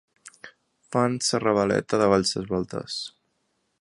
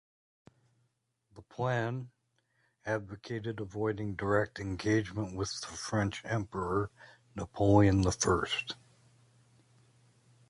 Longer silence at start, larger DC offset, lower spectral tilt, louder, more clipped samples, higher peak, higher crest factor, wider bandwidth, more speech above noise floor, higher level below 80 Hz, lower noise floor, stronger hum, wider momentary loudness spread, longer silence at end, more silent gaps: second, 0.25 s vs 1.35 s; neither; about the same, -4.5 dB/octave vs -5.5 dB/octave; first, -24 LUFS vs -32 LUFS; neither; first, -4 dBFS vs -12 dBFS; about the same, 22 dB vs 22 dB; about the same, 11.5 kHz vs 11.5 kHz; about the same, 49 dB vs 46 dB; about the same, -56 dBFS vs -52 dBFS; second, -73 dBFS vs -78 dBFS; neither; about the same, 14 LU vs 16 LU; second, 0.75 s vs 1.75 s; neither